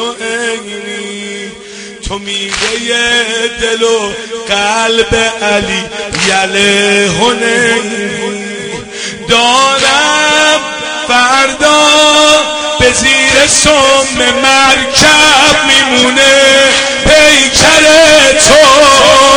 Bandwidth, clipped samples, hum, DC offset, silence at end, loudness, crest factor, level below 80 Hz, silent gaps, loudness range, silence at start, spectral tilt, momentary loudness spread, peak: over 20 kHz; 1%; none; under 0.1%; 0 s; -6 LUFS; 8 dB; -32 dBFS; none; 8 LU; 0 s; -1.5 dB/octave; 16 LU; 0 dBFS